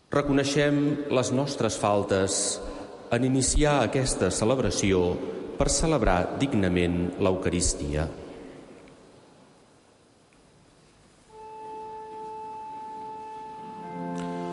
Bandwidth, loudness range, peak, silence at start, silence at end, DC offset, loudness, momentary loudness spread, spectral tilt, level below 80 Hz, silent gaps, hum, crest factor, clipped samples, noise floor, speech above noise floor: 11.5 kHz; 17 LU; -8 dBFS; 0.1 s; 0 s; under 0.1%; -25 LUFS; 17 LU; -4.5 dB/octave; -40 dBFS; none; none; 18 dB; under 0.1%; -59 dBFS; 34 dB